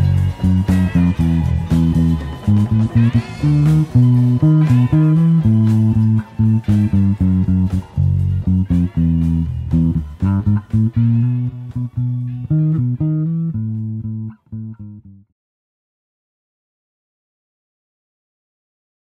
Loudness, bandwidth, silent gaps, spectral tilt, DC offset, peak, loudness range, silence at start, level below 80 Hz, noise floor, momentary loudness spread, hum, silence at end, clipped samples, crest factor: -16 LUFS; 8.8 kHz; none; -9.5 dB/octave; under 0.1%; -2 dBFS; 10 LU; 0 s; -32 dBFS; -37 dBFS; 10 LU; none; 4 s; under 0.1%; 14 dB